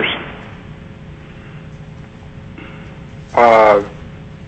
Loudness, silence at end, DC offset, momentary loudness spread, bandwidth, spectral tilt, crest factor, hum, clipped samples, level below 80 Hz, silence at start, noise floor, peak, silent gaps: -12 LUFS; 0 s; under 0.1%; 26 LU; 8.4 kHz; -6 dB/octave; 16 dB; none; under 0.1%; -42 dBFS; 0 s; -35 dBFS; -2 dBFS; none